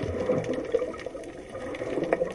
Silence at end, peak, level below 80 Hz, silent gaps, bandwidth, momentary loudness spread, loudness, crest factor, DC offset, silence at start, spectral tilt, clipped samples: 0 s; -8 dBFS; -52 dBFS; none; 11.5 kHz; 11 LU; -31 LUFS; 22 dB; under 0.1%; 0 s; -6.5 dB/octave; under 0.1%